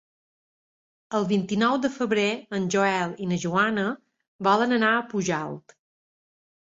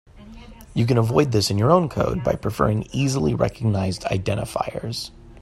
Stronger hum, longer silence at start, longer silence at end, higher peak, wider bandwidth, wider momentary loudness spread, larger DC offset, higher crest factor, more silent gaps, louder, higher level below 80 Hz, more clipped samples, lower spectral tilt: neither; first, 1.1 s vs 0.15 s; first, 1.15 s vs 0 s; second, -8 dBFS vs -2 dBFS; second, 7.8 kHz vs 13.5 kHz; about the same, 9 LU vs 10 LU; neither; about the same, 18 dB vs 20 dB; first, 4.28-4.39 s vs none; about the same, -24 LUFS vs -22 LUFS; second, -66 dBFS vs -42 dBFS; neither; about the same, -5 dB/octave vs -6 dB/octave